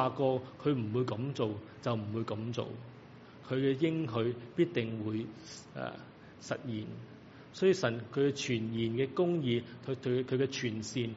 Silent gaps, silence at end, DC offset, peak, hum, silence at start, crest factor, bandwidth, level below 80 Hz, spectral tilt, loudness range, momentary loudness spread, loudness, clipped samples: none; 0 s; under 0.1%; -14 dBFS; none; 0 s; 20 dB; 7.6 kHz; -72 dBFS; -6 dB/octave; 4 LU; 18 LU; -34 LUFS; under 0.1%